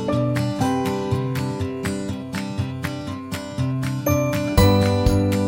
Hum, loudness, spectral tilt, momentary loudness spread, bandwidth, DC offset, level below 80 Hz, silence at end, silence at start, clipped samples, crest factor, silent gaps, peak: none; -22 LUFS; -6.5 dB/octave; 11 LU; 16.5 kHz; under 0.1%; -34 dBFS; 0 s; 0 s; under 0.1%; 18 dB; none; -2 dBFS